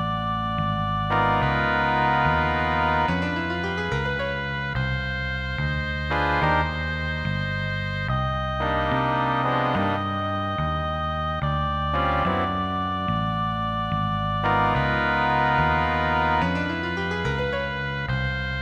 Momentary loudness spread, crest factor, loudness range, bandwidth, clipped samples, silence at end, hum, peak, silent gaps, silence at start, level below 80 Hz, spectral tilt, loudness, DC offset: 6 LU; 16 dB; 3 LU; 8.6 kHz; under 0.1%; 0 s; none; -6 dBFS; none; 0 s; -36 dBFS; -7 dB/octave; -24 LUFS; under 0.1%